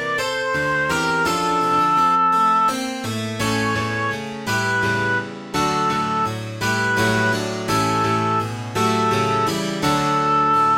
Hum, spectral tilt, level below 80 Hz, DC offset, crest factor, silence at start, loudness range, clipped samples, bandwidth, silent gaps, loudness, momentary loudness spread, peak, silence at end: none; -4.5 dB/octave; -50 dBFS; under 0.1%; 14 dB; 0 s; 3 LU; under 0.1%; 16.5 kHz; none; -19 LUFS; 8 LU; -6 dBFS; 0 s